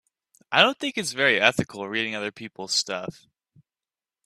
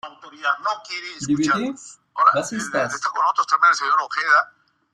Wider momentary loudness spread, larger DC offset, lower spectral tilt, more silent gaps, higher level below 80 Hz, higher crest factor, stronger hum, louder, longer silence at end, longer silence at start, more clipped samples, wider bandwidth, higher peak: about the same, 14 LU vs 14 LU; neither; about the same, -2.5 dB/octave vs -3 dB/octave; neither; about the same, -64 dBFS vs -64 dBFS; first, 24 dB vs 18 dB; neither; second, -23 LUFS vs -20 LUFS; first, 1.15 s vs 0.45 s; first, 0.5 s vs 0.05 s; neither; first, 14.5 kHz vs 12.5 kHz; about the same, -2 dBFS vs -2 dBFS